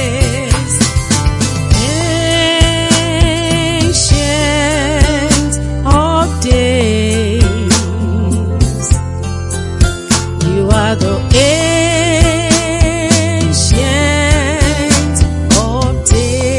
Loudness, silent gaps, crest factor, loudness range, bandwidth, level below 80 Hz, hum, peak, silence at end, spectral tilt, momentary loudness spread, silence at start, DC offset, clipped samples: -12 LUFS; none; 12 dB; 3 LU; 11.5 kHz; -20 dBFS; none; 0 dBFS; 0 s; -4.5 dB/octave; 4 LU; 0 s; under 0.1%; 0.1%